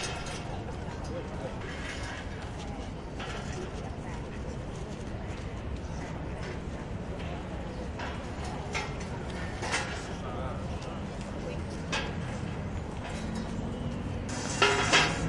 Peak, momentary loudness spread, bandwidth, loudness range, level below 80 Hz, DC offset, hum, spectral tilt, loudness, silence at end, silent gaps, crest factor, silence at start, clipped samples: -10 dBFS; 7 LU; 11.5 kHz; 3 LU; -44 dBFS; under 0.1%; none; -4 dB/octave; -34 LUFS; 0 s; none; 24 dB; 0 s; under 0.1%